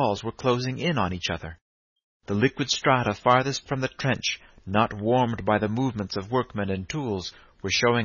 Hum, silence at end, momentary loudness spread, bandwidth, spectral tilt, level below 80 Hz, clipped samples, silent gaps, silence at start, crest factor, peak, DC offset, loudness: none; 0 s; 9 LU; 7.2 kHz; -5 dB/octave; -52 dBFS; under 0.1%; 1.61-1.96 s, 2.03-2.20 s; 0 s; 20 dB; -6 dBFS; under 0.1%; -25 LUFS